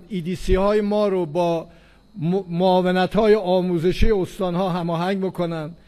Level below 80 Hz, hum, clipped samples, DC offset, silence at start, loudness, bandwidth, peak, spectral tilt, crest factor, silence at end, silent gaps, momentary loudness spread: -32 dBFS; none; under 0.1%; under 0.1%; 0.1 s; -21 LUFS; 13.5 kHz; -4 dBFS; -7.5 dB/octave; 16 dB; 0.15 s; none; 8 LU